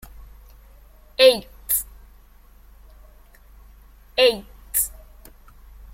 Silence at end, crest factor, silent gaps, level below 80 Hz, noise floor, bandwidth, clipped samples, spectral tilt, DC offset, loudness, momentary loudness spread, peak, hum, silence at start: 1.05 s; 24 dB; none; -46 dBFS; -49 dBFS; 16.5 kHz; under 0.1%; -1 dB/octave; under 0.1%; -20 LUFS; 17 LU; -2 dBFS; none; 0.2 s